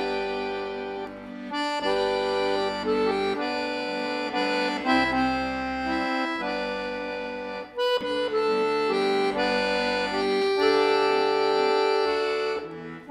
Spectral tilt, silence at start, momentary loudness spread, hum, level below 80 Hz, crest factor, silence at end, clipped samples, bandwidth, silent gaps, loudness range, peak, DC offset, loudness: -4.5 dB/octave; 0 s; 10 LU; none; -54 dBFS; 16 dB; 0 s; under 0.1%; 12.5 kHz; none; 4 LU; -10 dBFS; under 0.1%; -25 LUFS